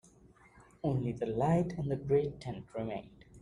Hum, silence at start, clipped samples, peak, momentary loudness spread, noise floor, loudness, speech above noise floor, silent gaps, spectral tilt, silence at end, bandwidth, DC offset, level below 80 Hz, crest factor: none; 0.55 s; under 0.1%; -18 dBFS; 11 LU; -61 dBFS; -34 LUFS; 28 dB; none; -8.5 dB/octave; 0 s; 10.5 kHz; under 0.1%; -58 dBFS; 18 dB